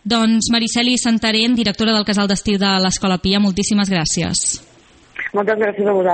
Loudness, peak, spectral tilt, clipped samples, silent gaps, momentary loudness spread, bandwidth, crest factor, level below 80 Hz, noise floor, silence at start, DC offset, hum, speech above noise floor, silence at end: -16 LUFS; -2 dBFS; -3.5 dB/octave; under 0.1%; none; 5 LU; 9 kHz; 16 dB; -42 dBFS; -48 dBFS; 0.05 s; under 0.1%; none; 32 dB; 0 s